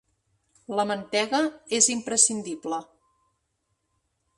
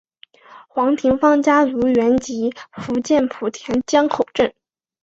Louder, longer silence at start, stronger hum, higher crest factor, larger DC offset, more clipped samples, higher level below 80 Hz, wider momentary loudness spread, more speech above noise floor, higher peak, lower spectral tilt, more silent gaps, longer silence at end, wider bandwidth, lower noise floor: second, -24 LUFS vs -18 LUFS; first, 0.7 s vs 0.5 s; neither; first, 24 dB vs 16 dB; neither; neither; second, -72 dBFS vs -52 dBFS; about the same, 12 LU vs 10 LU; first, 51 dB vs 30 dB; about the same, -4 dBFS vs -2 dBFS; second, -1.5 dB/octave vs -5 dB/octave; neither; first, 1.55 s vs 0.55 s; first, 11.5 kHz vs 8 kHz; first, -76 dBFS vs -47 dBFS